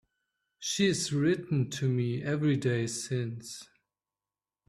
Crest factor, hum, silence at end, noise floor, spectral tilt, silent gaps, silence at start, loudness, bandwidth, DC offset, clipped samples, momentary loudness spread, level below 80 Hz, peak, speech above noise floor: 18 dB; none; 1.05 s; under -90 dBFS; -5 dB/octave; none; 0.6 s; -30 LUFS; 13.5 kHz; under 0.1%; under 0.1%; 11 LU; -68 dBFS; -14 dBFS; over 60 dB